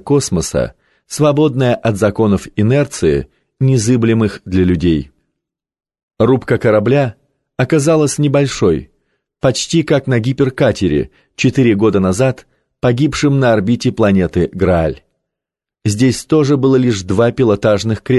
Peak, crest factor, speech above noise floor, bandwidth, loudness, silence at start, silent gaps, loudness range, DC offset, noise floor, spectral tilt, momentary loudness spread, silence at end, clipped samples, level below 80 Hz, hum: -2 dBFS; 12 dB; 71 dB; 12.5 kHz; -14 LUFS; 0.05 s; 6.03-6.08 s; 2 LU; under 0.1%; -84 dBFS; -6.5 dB/octave; 7 LU; 0 s; under 0.1%; -34 dBFS; none